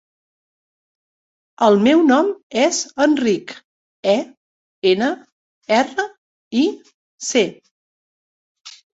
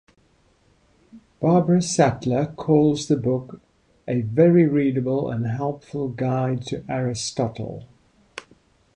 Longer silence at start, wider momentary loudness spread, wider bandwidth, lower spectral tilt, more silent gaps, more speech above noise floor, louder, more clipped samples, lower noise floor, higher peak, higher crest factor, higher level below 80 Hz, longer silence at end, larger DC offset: first, 1.6 s vs 1.15 s; second, 15 LU vs 18 LU; second, 8.2 kHz vs 10.5 kHz; second, -4 dB/octave vs -6.5 dB/octave; first, 2.43-2.50 s, 3.64-4.03 s, 4.37-4.82 s, 5.32-5.62 s, 6.18-6.51 s, 6.94-7.18 s, 7.71-8.55 s vs none; first, over 73 dB vs 40 dB; first, -18 LUFS vs -22 LUFS; neither; first, under -90 dBFS vs -61 dBFS; about the same, -2 dBFS vs -4 dBFS; about the same, 18 dB vs 20 dB; second, -64 dBFS vs -54 dBFS; second, 0.3 s vs 0.55 s; neither